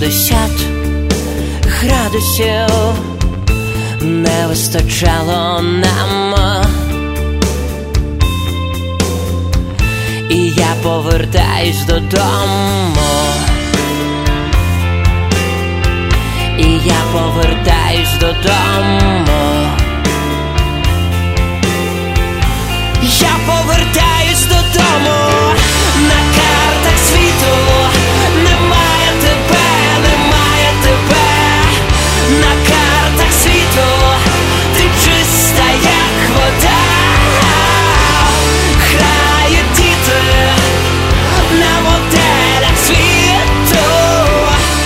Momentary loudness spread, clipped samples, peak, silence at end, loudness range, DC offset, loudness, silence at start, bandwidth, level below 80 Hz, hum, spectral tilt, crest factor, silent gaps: 7 LU; under 0.1%; 0 dBFS; 0 s; 5 LU; under 0.1%; -11 LUFS; 0 s; 16.5 kHz; -18 dBFS; none; -4 dB/octave; 10 dB; none